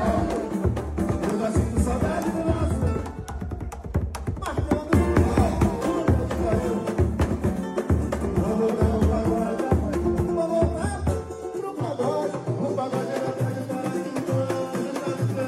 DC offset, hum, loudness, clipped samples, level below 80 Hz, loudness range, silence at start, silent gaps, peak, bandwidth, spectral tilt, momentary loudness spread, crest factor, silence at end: under 0.1%; none; -25 LUFS; under 0.1%; -32 dBFS; 4 LU; 0 s; none; -8 dBFS; 13 kHz; -7.5 dB/octave; 8 LU; 16 dB; 0 s